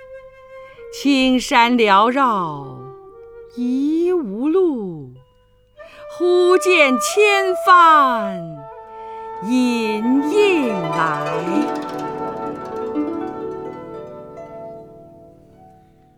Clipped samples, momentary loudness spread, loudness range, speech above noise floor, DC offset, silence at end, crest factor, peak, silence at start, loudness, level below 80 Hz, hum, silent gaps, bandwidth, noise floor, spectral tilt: under 0.1%; 22 LU; 13 LU; 39 dB; under 0.1%; 1.1 s; 18 dB; 0 dBFS; 0 s; -17 LUFS; -54 dBFS; none; none; 17.5 kHz; -55 dBFS; -4 dB/octave